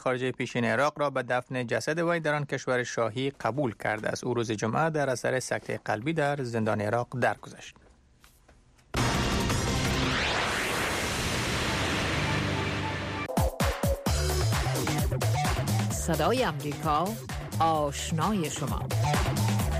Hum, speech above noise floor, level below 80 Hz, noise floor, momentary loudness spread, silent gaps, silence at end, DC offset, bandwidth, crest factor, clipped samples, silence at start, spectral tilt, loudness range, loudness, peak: none; 31 dB; -40 dBFS; -59 dBFS; 4 LU; none; 0 s; under 0.1%; 15.5 kHz; 14 dB; under 0.1%; 0 s; -4.5 dB/octave; 3 LU; -28 LUFS; -16 dBFS